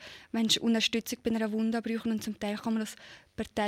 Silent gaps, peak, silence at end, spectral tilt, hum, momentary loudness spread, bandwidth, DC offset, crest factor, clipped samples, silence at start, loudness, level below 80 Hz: none; -12 dBFS; 0 s; -3.5 dB/octave; none; 13 LU; 15.5 kHz; under 0.1%; 20 dB; under 0.1%; 0 s; -31 LUFS; -62 dBFS